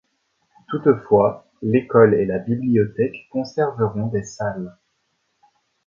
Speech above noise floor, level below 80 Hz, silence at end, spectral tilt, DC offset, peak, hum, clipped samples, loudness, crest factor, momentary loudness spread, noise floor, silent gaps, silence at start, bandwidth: 51 dB; -54 dBFS; 1.15 s; -8 dB/octave; under 0.1%; 0 dBFS; none; under 0.1%; -20 LUFS; 20 dB; 13 LU; -70 dBFS; none; 0.7 s; 7.4 kHz